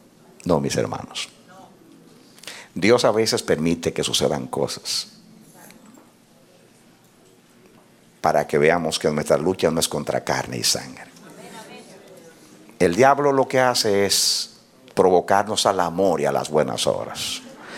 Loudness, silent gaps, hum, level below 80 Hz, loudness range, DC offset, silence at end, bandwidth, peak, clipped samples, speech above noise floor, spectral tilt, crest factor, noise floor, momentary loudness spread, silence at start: -20 LUFS; none; none; -56 dBFS; 8 LU; under 0.1%; 0 s; 17 kHz; -2 dBFS; under 0.1%; 33 dB; -3.5 dB/octave; 20 dB; -53 dBFS; 17 LU; 0.45 s